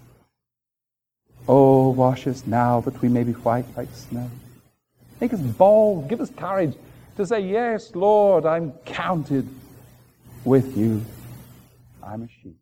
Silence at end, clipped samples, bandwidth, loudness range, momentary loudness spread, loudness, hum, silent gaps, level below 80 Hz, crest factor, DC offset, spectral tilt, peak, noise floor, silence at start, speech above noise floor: 0.1 s; under 0.1%; 16.5 kHz; 5 LU; 20 LU; -21 LUFS; none; none; -56 dBFS; 18 dB; under 0.1%; -8.5 dB/octave; -2 dBFS; -87 dBFS; 1.4 s; 66 dB